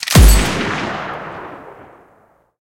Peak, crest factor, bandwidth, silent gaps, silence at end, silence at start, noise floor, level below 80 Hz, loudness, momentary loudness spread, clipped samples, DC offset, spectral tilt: 0 dBFS; 16 dB; 17 kHz; none; 0.9 s; 0 s; -53 dBFS; -18 dBFS; -15 LUFS; 23 LU; under 0.1%; under 0.1%; -4.5 dB/octave